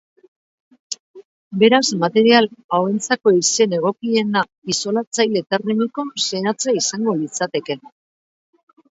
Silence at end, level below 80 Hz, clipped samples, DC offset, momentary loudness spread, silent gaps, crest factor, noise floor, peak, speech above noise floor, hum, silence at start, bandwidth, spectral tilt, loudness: 1.05 s; -68 dBFS; under 0.1%; under 0.1%; 12 LU; 0.99-1.14 s, 1.25-1.51 s, 2.64-2.69 s, 4.58-4.62 s, 5.07-5.11 s; 18 dB; under -90 dBFS; 0 dBFS; over 72 dB; none; 0.9 s; 8 kHz; -3.5 dB/octave; -18 LUFS